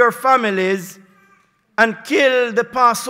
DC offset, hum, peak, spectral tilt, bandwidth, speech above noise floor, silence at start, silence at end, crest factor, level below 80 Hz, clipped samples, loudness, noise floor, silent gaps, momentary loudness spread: under 0.1%; none; -2 dBFS; -3.5 dB/octave; 16 kHz; 40 dB; 0 s; 0 s; 16 dB; -64 dBFS; under 0.1%; -16 LUFS; -56 dBFS; none; 10 LU